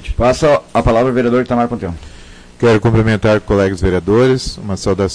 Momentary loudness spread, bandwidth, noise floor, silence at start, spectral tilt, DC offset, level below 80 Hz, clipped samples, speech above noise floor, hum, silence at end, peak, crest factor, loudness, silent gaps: 8 LU; 10.5 kHz; -36 dBFS; 0 s; -6.5 dB/octave; under 0.1%; -28 dBFS; under 0.1%; 23 dB; none; 0 s; -4 dBFS; 10 dB; -14 LUFS; none